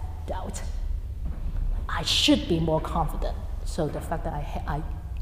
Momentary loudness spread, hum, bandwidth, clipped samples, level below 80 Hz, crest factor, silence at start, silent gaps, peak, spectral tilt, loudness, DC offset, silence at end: 14 LU; none; 15.5 kHz; under 0.1%; -32 dBFS; 20 dB; 0 s; none; -8 dBFS; -4.5 dB/octave; -28 LUFS; under 0.1%; 0 s